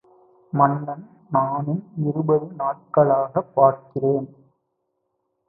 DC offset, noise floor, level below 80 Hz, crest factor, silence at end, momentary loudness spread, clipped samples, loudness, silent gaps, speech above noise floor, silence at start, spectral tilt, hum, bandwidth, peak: under 0.1%; -75 dBFS; -66 dBFS; 20 dB; 1.2 s; 10 LU; under 0.1%; -22 LUFS; none; 54 dB; 0.55 s; -15 dB/octave; none; 2.6 kHz; -2 dBFS